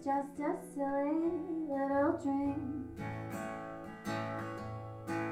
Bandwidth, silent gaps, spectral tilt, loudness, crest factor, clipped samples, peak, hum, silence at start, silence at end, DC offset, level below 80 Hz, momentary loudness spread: 15.5 kHz; none; -7 dB/octave; -37 LUFS; 18 dB; under 0.1%; -20 dBFS; none; 0 s; 0 s; under 0.1%; -62 dBFS; 11 LU